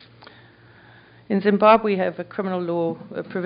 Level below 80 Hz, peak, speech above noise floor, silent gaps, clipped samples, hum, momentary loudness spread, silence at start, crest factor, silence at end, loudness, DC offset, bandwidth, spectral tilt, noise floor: -64 dBFS; -2 dBFS; 29 dB; none; under 0.1%; none; 14 LU; 1.3 s; 20 dB; 0 s; -21 LUFS; under 0.1%; 5.2 kHz; -5 dB/octave; -50 dBFS